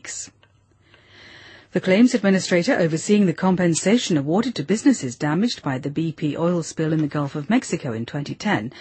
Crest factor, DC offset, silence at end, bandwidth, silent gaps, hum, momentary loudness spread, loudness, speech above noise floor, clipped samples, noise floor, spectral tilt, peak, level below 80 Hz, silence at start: 16 dB; under 0.1%; 0 s; 8.8 kHz; none; none; 9 LU; -21 LUFS; 37 dB; under 0.1%; -57 dBFS; -5.5 dB/octave; -6 dBFS; -60 dBFS; 0.05 s